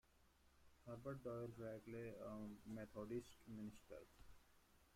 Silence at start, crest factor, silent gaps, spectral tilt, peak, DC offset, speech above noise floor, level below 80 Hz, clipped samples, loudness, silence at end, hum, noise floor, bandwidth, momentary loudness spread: 0.05 s; 18 dB; none; -7 dB/octave; -38 dBFS; under 0.1%; 22 dB; -74 dBFS; under 0.1%; -55 LUFS; 0 s; none; -75 dBFS; 16 kHz; 11 LU